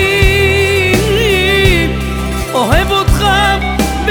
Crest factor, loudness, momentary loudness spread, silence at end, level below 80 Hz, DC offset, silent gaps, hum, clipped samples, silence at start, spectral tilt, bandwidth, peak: 12 dB; -11 LUFS; 6 LU; 0 s; -18 dBFS; under 0.1%; none; none; under 0.1%; 0 s; -4.5 dB/octave; over 20 kHz; 0 dBFS